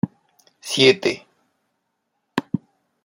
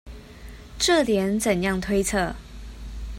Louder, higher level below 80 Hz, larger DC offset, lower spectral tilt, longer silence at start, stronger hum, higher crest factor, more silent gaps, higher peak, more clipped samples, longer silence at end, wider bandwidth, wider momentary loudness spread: first, -20 LUFS vs -23 LUFS; second, -66 dBFS vs -38 dBFS; neither; about the same, -4 dB/octave vs -4 dB/octave; about the same, 0.05 s vs 0.05 s; neither; first, 22 dB vs 16 dB; neither; first, -2 dBFS vs -8 dBFS; neither; first, 0.45 s vs 0 s; about the same, 16.5 kHz vs 16 kHz; second, 17 LU vs 23 LU